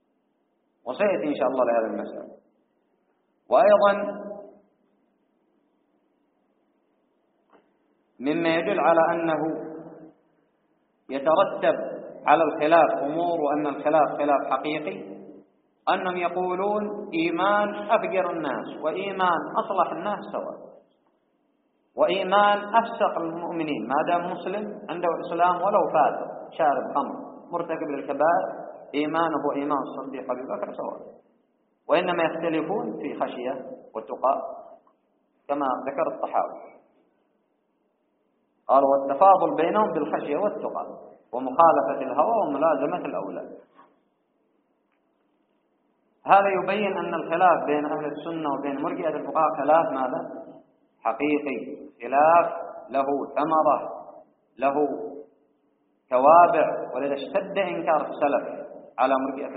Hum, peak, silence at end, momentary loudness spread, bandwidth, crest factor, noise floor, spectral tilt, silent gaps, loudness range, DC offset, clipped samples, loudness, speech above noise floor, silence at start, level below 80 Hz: none; -2 dBFS; 0 s; 16 LU; 4.5 kHz; 22 dB; -71 dBFS; -3.5 dB/octave; none; 7 LU; under 0.1%; under 0.1%; -24 LUFS; 48 dB; 0.85 s; -74 dBFS